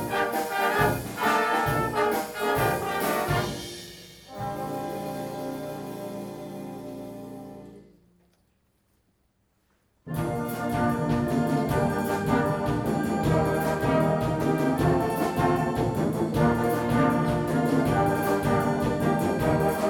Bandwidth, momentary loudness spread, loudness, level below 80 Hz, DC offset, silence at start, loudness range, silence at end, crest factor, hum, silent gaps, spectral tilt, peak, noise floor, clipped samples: 19.5 kHz; 14 LU; -26 LUFS; -46 dBFS; under 0.1%; 0 s; 15 LU; 0 s; 18 dB; none; none; -6.5 dB/octave; -8 dBFS; -70 dBFS; under 0.1%